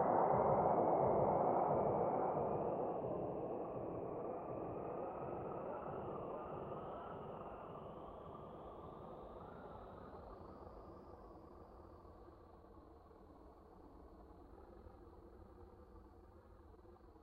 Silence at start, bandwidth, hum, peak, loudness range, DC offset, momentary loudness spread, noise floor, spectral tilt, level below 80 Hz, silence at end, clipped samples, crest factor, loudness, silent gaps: 0 s; 5 kHz; none; -22 dBFS; 23 LU; under 0.1%; 27 LU; -62 dBFS; -8.5 dB/octave; -66 dBFS; 0 s; under 0.1%; 20 dB; -41 LUFS; none